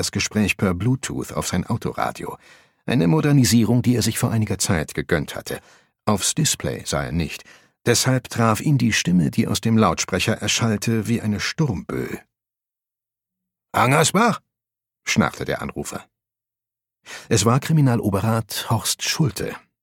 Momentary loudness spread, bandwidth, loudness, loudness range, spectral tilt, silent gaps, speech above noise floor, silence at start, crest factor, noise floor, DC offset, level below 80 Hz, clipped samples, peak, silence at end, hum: 14 LU; 17.5 kHz; -21 LUFS; 4 LU; -4.5 dB/octave; none; 68 dB; 0 s; 20 dB; -88 dBFS; under 0.1%; -46 dBFS; under 0.1%; -2 dBFS; 0.25 s; none